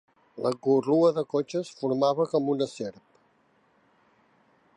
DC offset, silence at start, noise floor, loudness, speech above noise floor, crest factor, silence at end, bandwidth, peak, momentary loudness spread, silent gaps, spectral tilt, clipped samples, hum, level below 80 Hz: under 0.1%; 0.35 s; -66 dBFS; -26 LUFS; 40 dB; 18 dB; 1.85 s; 10.5 kHz; -10 dBFS; 9 LU; none; -7 dB/octave; under 0.1%; none; -78 dBFS